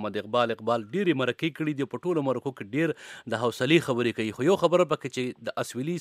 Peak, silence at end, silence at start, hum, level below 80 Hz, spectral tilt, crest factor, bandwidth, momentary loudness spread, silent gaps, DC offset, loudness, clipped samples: -6 dBFS; 0 s; 0 s; none; -72 dBFS; -5.5 dB/octave; 20 dB; 15 kHz; 9 LU; none; under 0.1%; -27 LUFS; under 0.1%